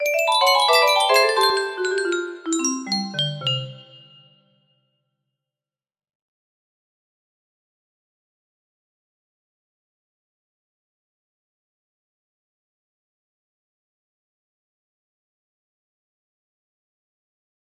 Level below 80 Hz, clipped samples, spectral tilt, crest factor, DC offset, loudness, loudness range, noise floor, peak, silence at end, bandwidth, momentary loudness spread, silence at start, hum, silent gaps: -76 dBFS; under 0.1%; -2.5 dB/octave; 22 dB; under 0.1%; -19 LUFS; 12 LU; under -90 dBFS; -4 dBFS; 13.85 s; 16 kHz; 10 LU; 0 s; none; none